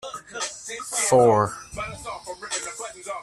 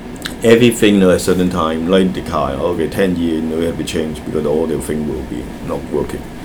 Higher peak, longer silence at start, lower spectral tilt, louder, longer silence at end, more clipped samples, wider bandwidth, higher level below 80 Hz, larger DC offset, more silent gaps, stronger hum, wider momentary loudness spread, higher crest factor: second, -6 dBFS vs 0 dBFS; about the same, 0.05 s vs 0 s; second, -3.5 dB/octave vs -5.5 dB/octave; second, -24 LUFS vs -16 LUFS; about the same, 0 s vs 0 s; neither; second, 14 kHz vs over 20 kHz; second, -54 dBFS vs -34 dBFS; neither; neither; neither; first, 18 LU vs 13 LU; about the same, 20 dB vs 16 dB